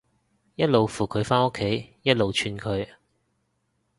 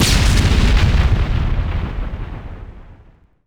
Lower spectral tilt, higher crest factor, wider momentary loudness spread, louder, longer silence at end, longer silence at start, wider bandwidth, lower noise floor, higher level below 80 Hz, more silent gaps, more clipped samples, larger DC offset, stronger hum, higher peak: about the same, -5.5 dB/octave vs -4.5 dB/octave; first, 22 dB vs 14 dB; second, 9 LU vs 18 LU; second, -24 LUFS vs -17 LUFS; first, 1.15 s vs 0.55 s; first, 0.6 s vs 0 s; second, 11.5 kHz vs 17 kHz; first, -73 dBFS vs -48 dBFS; second, -52 dBFS vs -18 dBFS; neither; neither; neither; neither; about the same, -4 dBFS vs -2 dBFS